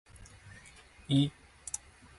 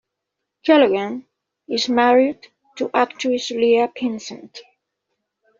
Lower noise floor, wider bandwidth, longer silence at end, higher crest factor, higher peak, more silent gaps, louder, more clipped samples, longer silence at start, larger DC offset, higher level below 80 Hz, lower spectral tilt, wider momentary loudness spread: second, -56 dBFS vs -80 dBFS; first, 11.5 kHz vs 7.6 kHz; second, 0.4 s vs 1 s; about the same, 20 dB vs 18 dB; second, -16 dBFS vs -2 dBFS; neither; second, -33 LUFS vs -19 LUFS; neither; second, 0.15 s vs 0.65 s; neither; first, -60 dBFS vs -68 dBFS; first, -5 dB/octave vs -2 dB/octave; first, 24 LU vs 17 LU